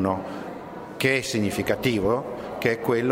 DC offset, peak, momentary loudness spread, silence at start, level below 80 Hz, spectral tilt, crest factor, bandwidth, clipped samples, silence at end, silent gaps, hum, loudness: under 0.1%; -6 dBFS; 13 LU; 0 s; -52 dBFS; -5 dB/octave; 20 dB; 16 kHz; under 0.1%; 0 s; none; none; -25 LUFS